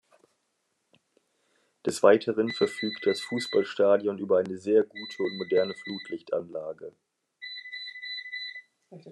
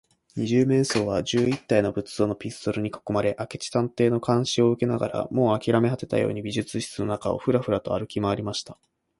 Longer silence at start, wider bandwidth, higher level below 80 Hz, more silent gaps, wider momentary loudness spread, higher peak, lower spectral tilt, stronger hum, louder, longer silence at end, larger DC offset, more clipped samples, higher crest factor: first, 1.85 s vs 0.35 s; about the same, 12.5 kHz vs 11.5 kHz; second, -82 dBFS vs -54 dBFS; neither; first, 16 LU vs 8 LU; about the same, -6 dBFS vs -6 dBFS; second, -4.5 dB/octave vs -6 dB/octave; neither; second, -28 LUFS vs -25 LUFS; second, 0 s vs 0.45 s; neither; neither; about the same, 22 dB vs 18 dB